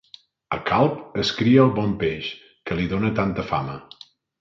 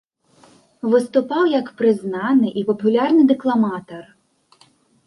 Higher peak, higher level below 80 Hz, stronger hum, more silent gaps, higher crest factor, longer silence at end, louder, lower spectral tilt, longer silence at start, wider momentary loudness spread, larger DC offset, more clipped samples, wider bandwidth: about the same, -2 dBFS vs -4 dBFS; first, -48 dBFS vs -68 dBFS; neither; neither; about the same, 20 dB vs 16 dB; second, 0.6 s vs 1.05 s; second, -22 LUFS vs -18 LUFS; about the same, -7 dB/octave vs -7 dB/octave; second, 0.5 s vs 0.85 s; first, 15 LU vs 11 LU; neither; neither; second, 7.4 kHz vs 11.5 kHz